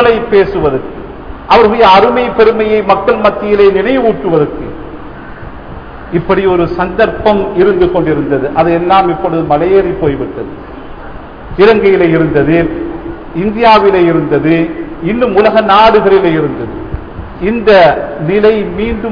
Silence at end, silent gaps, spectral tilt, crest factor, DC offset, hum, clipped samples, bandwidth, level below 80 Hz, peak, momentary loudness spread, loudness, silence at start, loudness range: 0 s; none; -8 dB/octave; 10 dB; 0.6%; none; 0.3%; 5.4 kHz; -30 dBFS; 0 dBFS; 21 LU; -9 LUFS; 0 s; 4 LU